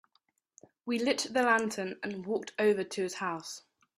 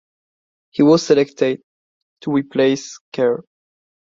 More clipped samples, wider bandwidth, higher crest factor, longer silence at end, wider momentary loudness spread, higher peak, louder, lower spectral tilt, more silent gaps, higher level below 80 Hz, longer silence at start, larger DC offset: neither; first, 14.5 kHz vs 7.8 kHz; about the same, 22 dB vs 18 dB; second, 0.4 s vs 0.7 s; about the same, 13 LU vs 15 LU; second, -12 dBFS vs 0 dBFS; second, -31 LUFS vs -17 LUFS; second, -3.5 dB/octave vs -5.5 dB/octave; second, none vs 1.64-2.16 s, 3.01-3.12 s; second, -76 dBFS vs -62 dBFS; about the same, 0.85 s vs 0.75 s; neither